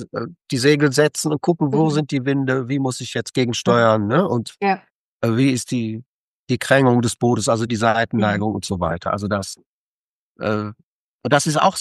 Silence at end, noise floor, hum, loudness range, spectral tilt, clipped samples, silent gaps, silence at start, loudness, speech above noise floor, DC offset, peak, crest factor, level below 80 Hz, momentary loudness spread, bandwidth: 0 s; under -90 dBFS; none; 3 LU; -5.5 dB/octave; under 0.1%; 4.90-5.20 s, 6.06-6.47 s, 9.66-10.35 s, 10.83-11.19 s; 0 s; -19 LUFS; over 71 dB; under 0.1%; -2 dBFS; 18 dB; -54 dBFS; 10 LU; 12.5 kHz